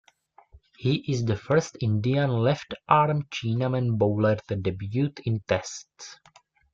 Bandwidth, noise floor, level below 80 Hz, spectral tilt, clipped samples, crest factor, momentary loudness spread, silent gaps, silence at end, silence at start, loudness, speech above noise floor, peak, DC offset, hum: 7.6 kHz; -59 dBFS; -58 dBFS; -6.5 dB/octave; under 0.1%; 22 dB; 8 LU; none; 0.6 s; 0.55 s; -26 LUFS; 34 dB; -4 dBFS; under 0.1%; none